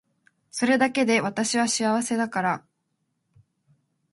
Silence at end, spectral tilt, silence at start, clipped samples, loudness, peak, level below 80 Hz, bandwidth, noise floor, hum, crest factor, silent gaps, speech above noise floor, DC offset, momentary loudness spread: 1.55 s; -3.5 dB/octave; 0.55 s; under 0.1%; -24 LUFS; -6 dBFS; -72 dBFS; 11.5 kHz; -76 dBFS; none; 20 dB; none; 52 dB; under 0.1%; 7 LU